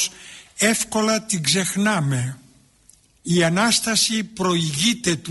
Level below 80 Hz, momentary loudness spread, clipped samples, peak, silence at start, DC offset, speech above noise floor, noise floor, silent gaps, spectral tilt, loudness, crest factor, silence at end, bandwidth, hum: -56 dBFS; 8 LU; under 0.1%; -6 dBFS; 0 s; under 0.1%; 35 dB; -55 dBFS; none; -3.5 dB/octave; -20 LUFS; 16 dB; 0 s; 12 kHz; none